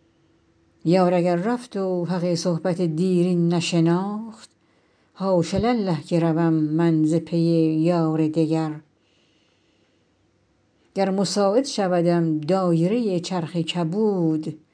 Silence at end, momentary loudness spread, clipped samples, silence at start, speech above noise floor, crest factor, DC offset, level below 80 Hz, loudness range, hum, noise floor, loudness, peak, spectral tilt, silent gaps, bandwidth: 0.15 s; 6 LU; under 0.1%; 0.85 s; 43 dB; 14 dB; under 0.1%; -58 dBFS; 5 LU; none; -64 dBFS; -22 LUFS; -8 dBFS; -7 dB/octave; none; 10.5 kHz